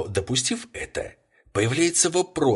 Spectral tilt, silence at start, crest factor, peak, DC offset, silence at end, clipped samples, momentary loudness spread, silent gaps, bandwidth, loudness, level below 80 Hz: -3.5 dB/octave; 0 s; 18 dB; -6 dBFS; under 0.1%; 0 s; under 0.1%; 13 LU; none; 11.5 kHz; -23 LUFS; -48 dBFS